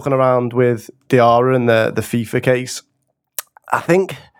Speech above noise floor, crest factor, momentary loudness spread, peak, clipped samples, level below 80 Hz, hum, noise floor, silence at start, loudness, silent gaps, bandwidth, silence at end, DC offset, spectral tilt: 52 dB; 16 dB; 16 LU; 0 dBFS; under 0.1%; -58 dBFS; none; -68 dBFS; 0 s; -16 LUFS; none; over 20 kHz; 0.2 s; under 0.1%; -6 dB/octave